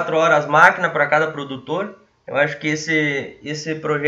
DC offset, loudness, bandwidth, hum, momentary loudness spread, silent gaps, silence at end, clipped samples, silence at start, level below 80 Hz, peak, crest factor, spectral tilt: under 0.1%; -18 LUFS; 10.5 kHz; none; 14 LU; none; 0 s; under 0.1%; 0 s; -62 dBFS; 0 dBFS; 18 dB; -4.5 dB/octave